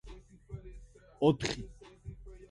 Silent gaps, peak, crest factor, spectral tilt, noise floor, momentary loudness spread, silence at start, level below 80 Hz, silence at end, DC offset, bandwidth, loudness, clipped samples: none; -12 dBFS; 24 dB; -6 dB/octave; -53 dBFS; 25 LU; 0.05 s; -52 dBFS; 0.05 s; under 0.1%; 11.5 kHz; -32 LUFS; under 0.1%